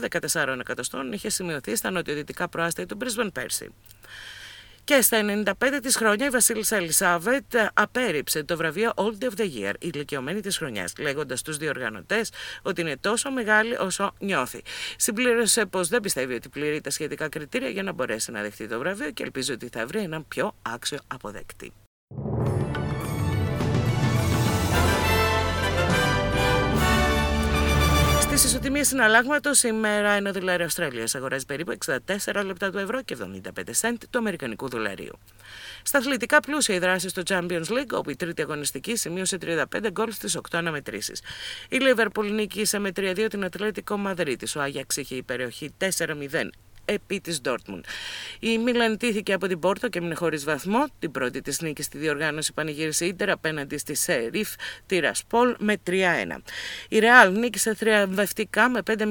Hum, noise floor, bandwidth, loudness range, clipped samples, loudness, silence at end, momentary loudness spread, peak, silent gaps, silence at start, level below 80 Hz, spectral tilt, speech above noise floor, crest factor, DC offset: none; -45 dBFS; 19 kHz; 8 LU; under 0.1%; -24 LUFS; 0 s; 11 LU; 0 dBFS; 21.87-22.07 s; 0 s; -40 dBFS; -3.5 dB/octave; 19 dB; 26 dB; under 0.1%